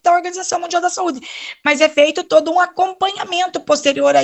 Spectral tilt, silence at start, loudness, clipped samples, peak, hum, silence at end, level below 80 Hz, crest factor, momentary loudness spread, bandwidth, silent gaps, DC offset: -1.5 dB/octave; 0.05 s; -16 LUFS; under 0.1%; 0 dBFS; none; 0 s; -64 dBFS; 16 dB; 8 LU; 8.6 kHz; none; under 0.1%